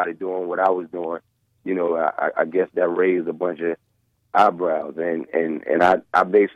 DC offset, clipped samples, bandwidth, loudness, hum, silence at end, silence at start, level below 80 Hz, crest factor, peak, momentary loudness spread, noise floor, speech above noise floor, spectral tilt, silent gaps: under 0.1%; under 0.1%; 9.2 kHz; -21 LUFS; none; 0.05 s; 0 s; -64 dBFS; 16 dB; -4 dBFS; 10 LU; -61 dBFS; 40 dB; -7 dB/octave; none